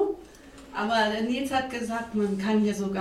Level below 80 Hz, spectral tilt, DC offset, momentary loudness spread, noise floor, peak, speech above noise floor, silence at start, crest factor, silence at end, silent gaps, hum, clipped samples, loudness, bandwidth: -56 dBFS; -5 dB/octave; under 0.1%; 7 LU; -48 dBFS; -12 dBFS; 21 dB; 0 s; 16 dB; 0 s; none; none; under 0.1%; -27 LUFS; 13.5 kHz